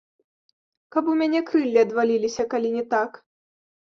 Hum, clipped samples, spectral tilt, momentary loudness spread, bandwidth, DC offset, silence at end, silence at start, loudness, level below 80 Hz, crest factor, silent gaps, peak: none; under 0.1%; -5 dB/octave; 6 LU; 7.4 kHz; under 0.1%; 0.7 s; 0.95 s; -23 LUFS; -68 dBFS; 18 dB; none; -8 dBFS